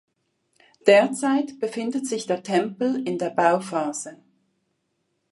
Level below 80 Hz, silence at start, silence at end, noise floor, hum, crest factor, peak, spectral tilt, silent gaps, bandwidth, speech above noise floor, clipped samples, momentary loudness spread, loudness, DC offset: -78 dBFS; 0.85 s; 1.2 s; -74 dBFS; none; 22 dB; -2 dBFS; -4.5 dB/octave; none; 11.5 kHz; 52 dB; under 0.1%; 11 LU; -23 LUFS; under 0.1%